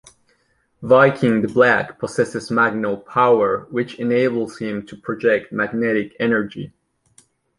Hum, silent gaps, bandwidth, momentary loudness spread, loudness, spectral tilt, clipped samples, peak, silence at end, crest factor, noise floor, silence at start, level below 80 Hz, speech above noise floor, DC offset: none; none; 11.5 kHz; 12 LU; -19 LUFS; -6.5 dB/octave; under 0.1%; -2 dBFS; 0.9 s; 18 dB; -64 dBFS; 0.8 s; -58 dBFS; 45 dB; under 0.1%